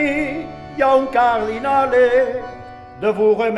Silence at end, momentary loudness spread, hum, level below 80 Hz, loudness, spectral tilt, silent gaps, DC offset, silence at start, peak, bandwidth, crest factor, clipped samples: 0 s; 16 LU; none; -46 dBFS; -17 LUFS; -6 dB/octave; none; under 0.1%; 0 s; -4 dBFS; 10.5 kHz; 14 dB; under 0.1%